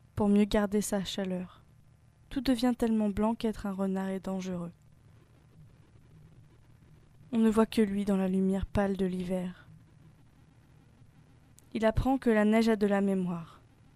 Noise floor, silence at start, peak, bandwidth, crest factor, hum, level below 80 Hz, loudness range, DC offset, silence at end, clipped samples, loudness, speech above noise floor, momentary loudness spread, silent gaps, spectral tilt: -60 dBFS; 0.15 s; -12 dBFS; 14.5 kHz; 20 dB; none; -48 dBFS; 8 LU; under 0.1%; 0.5 s; under 0.1%; -30 LUFS; 31 dB; 12 LU; none; -6.5 dB/octave